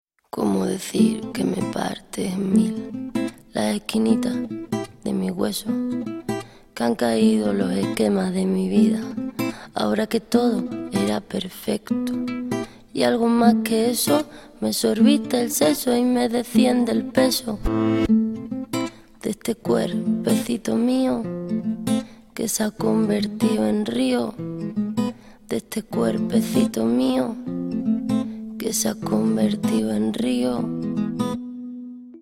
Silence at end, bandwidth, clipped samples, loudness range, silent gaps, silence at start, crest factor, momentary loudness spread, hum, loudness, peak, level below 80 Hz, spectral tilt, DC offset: 0.05 s; 16.5 kHz; under 0.1%; 4 LU; none; 0.35 s; 18 dB; 10 LU; none; -22 LUFS; -2 dBFS; -48 dBFS; -5 dB/octave; under 0.1%